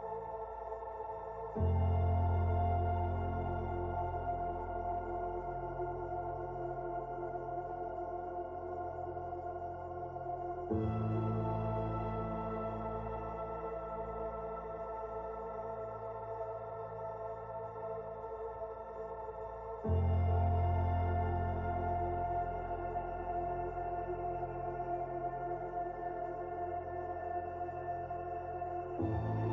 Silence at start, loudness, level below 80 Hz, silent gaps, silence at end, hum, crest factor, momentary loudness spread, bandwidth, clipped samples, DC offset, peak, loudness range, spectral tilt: 0 s; -39 LUFS; -44 dBFS; none; 0 s; none; 16 dB; 10 LU; 3.8 kHz; under 0.1%; under 0.1%; -22 dBFS; 7 LU; -9 dB/octave